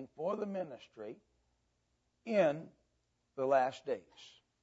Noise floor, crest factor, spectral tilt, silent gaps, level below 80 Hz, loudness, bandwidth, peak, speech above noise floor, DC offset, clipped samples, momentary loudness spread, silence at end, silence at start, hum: -80 dBFS; 20 dB; -4.5 dB/octave; none; -82 dBFS; -36 LUFS; 7.6 kHz; -18 dBFS; 44 dB; under 0.1%; under 0.1%; 24 LU; 0.35 s; 0 s; 60 Hz at -80 dBFS